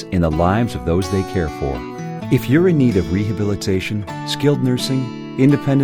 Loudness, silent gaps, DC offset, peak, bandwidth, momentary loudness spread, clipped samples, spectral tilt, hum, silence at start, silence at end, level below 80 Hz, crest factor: -18 LUFS; none; under 0.1%; -2 dBFS; 19 kHz; 10 LU; under 0.1%; -7 dB/octave; none; 0 s; 0 s; -36 dBFS; 16 dB